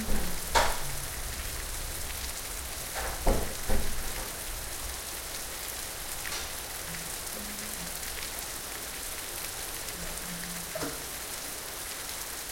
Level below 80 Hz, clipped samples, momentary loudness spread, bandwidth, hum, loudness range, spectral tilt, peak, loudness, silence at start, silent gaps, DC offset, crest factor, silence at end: -38 dBFS; under 0.1%; 5 LU; 17 kHz; none; 3 LU; -2 dB/octave; -10 dBFS; -34 LUFS; 0 s; none; under 0.1%; 22 dB; 0 s